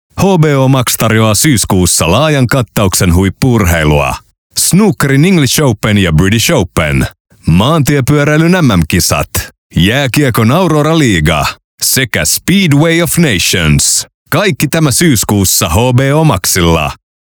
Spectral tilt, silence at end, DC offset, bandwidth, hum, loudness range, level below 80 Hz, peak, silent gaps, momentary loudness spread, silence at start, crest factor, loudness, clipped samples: -4.5 dB/octave; 0.4 s; under 0.1%; over 20 kHz; none; 1 LU; -30 dBFS; 0 dBFS; 4.38-4.50 s, 7.20-7.25 s, 9.58-9.70 s, 11.64-11.78 s, 14.14-14.26 s; 5 LU; 0.15 s; 10 dB; -9 LUFS; under 0.1%